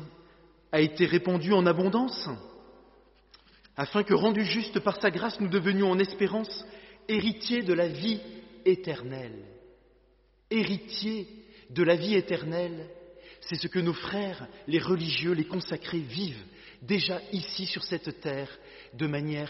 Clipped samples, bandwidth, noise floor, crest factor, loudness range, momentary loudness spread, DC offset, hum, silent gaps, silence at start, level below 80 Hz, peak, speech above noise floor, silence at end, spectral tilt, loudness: under 0.1%; 6 kHz; -64 dBFS; 20 dB; 5 LU; 18 LU; under 0.1%; none; none; 0 s; -64 dBFS; -10 dBFS; 36 dB; 0 s; -4.5 dB/octave; -29 LUFS